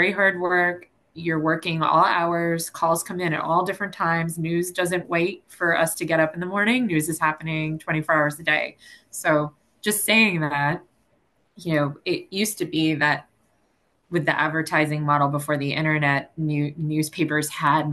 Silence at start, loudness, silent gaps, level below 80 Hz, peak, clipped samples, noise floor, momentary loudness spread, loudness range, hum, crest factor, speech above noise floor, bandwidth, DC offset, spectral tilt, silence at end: 0 s; -23 LUFS; none; -62 dBFS; -6 dBFS; under 0.1%; -67 dBFS; 7 LU; 2 LU; none; 16 dB; 44 dB; 13 kHz; under 0.1%; -4.5 dB/octave; 0 s